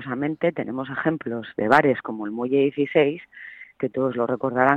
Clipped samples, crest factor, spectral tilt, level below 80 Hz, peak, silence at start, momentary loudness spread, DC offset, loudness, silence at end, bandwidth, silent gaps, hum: under 0.1%; 20 dB; -8 dB/octave; -64 dBFS; -2 dBFS; 0 s; 12 LU; under 0.1%; -23 LUFS; 0 s; 9 kHz; none; none